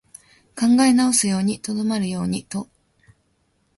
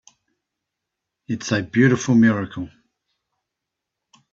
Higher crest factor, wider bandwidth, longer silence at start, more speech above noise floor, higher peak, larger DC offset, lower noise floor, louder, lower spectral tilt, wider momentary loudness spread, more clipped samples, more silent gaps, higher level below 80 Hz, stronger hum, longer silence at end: about the same, 18 dB vs 18 dB; first, 11.5 kHz vs 7.6 kHz; second, 0.55 s vs 1.3 s; second, 47 dB vs 64 dB; about the same, -4 dBFS vs -4 dBFS; neither; second, -66 dBFS vs -83 dBFS; about the same, -20 LUFS vs -19 LUFS; second, -4 dB/octave vs -6 dB/octave; about the same, 16 LU vs 16 LU; neither; neither; about the same, -56 dBFS vs -60 dBFS; neither; second, 1.15 s vs 1.65 s